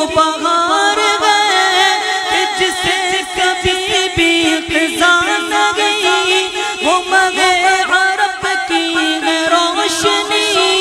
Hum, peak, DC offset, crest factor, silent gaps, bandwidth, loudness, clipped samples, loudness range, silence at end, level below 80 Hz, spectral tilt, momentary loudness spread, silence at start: none; 0 dBFS; under 0.1%; 14 dB; none; 16 kHz; -12 LUFS; under 0.1%; 1 LU; 0 s; -44 dBFS; -1.5 dB/octave; 4 LU; 0 s